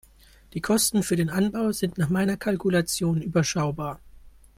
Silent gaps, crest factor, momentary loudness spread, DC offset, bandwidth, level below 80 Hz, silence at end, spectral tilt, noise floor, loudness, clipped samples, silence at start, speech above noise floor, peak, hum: none; 16 dB; 11 LU; under 0.1%; 16.5 kHz; -52 dBFS; 0.3 s; -5 dB/octave; -53 dBFS; -25 LUFS; under 0.1%; 0.55 s; 29 dB; -10 dBFS; none